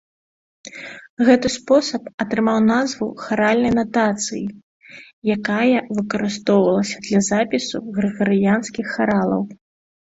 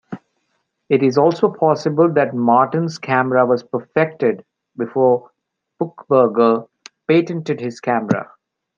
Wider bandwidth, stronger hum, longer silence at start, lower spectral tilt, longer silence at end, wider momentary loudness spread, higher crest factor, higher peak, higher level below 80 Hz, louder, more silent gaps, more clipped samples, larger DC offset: about the same, 8 kHz vs 7.4 kHz; neither; first, 0.65 s vs 0.1 s; second, -5 dB/octave vs -7.5 dB/octave; about the same, 0.55 s vs 0.55 s; about the same, 10 LU vs 12 LU; about the same, 18 dB vs 16 dB; about the same, -2 dBFS vs -2 dBFS; first, -54 dBFS vs -66 dBFS; about the same, -19 LUFS vs -17 LUFS; first, 1.10-1.17 s, 2.14-2.18 s, 4.63-4.80 s, 5.13-5.22 s vs none; neither; neither